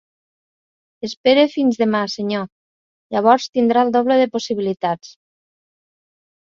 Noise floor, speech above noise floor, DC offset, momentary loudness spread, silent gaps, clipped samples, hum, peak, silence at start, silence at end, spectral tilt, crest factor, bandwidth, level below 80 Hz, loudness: under -90 dBFS; over 73 dB; under 0.1%; 11 LU; 1.17-1.24 s, 2.52-3.10 s, 3.49-3.53 s; under 0.1%; none; -2 dBFS; 1.05 s; 1.5 s; -5 dB/octave; 18 dB; 7.6 kHz; -66 dBFS; -18 LUFS